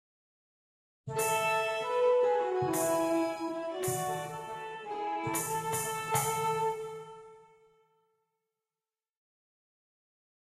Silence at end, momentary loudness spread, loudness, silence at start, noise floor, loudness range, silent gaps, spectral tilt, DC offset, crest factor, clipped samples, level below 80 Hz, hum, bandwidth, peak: 3.05 s; 13 LU; -32 LUFS; 1.05 s; under -90 dBFS; 7 LU; none; -4 dB/octave; under 0.1%; 16 dB; under 0.1%; -70 dBFS; none; 13.5 kHz; -18 dBFS